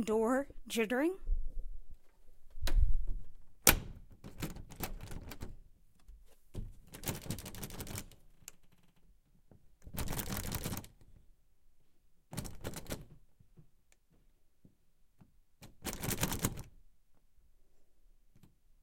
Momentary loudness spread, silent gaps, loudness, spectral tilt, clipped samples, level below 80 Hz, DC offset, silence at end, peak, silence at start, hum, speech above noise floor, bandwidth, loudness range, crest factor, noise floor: 21 LU; none; -37 LUFS; -3.5 dB/octave; under 0.1%; -42 dBFS; under 0.1%; 1 s; -4 dBFS; 0 s; none; 33 dB; 17 kHz; 15 LU; 32 dB; -67 dBFS